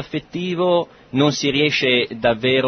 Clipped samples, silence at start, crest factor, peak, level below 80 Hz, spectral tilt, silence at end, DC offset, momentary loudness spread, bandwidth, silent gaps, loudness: under 0.1%; 0 s; 16 dB; -4 dBFS; -52 dBFS; -4.5 dB/octave; 0 s; under 0.1%; 9 LU; 6.6 kHz; none; -19 LUFS